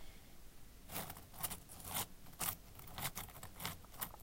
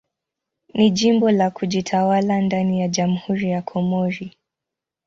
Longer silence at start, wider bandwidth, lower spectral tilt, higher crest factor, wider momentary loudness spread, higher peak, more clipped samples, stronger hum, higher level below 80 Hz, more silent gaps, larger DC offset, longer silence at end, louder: second, 0 s vs 0.75 s; first, 17 kHz vs 7.6 kHz; second, -2 dB/octave vs -6 dB/octave; first, 26 dB vs 16 dB; first, 19 LU vs 8 LU; second, -22 dBFS vs -4 dBFS; neither; neither; about the same, -60 dBFS vs -58 dBFS; neither; neither; second, 0 s vs 0.8 s; second, -45 LUFS vs -20 LUFS